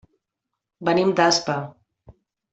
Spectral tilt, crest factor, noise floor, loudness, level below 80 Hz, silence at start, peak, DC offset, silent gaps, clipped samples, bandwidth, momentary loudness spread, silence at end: -4 dB/octave; 20 dB; -83 dBFS; -21 LUFS; -62 dBFS; 0.8 s; -4 dBFS; under 0.1%; none; under 0.1%; 8.2 kHz; 11 LU; 0.4 s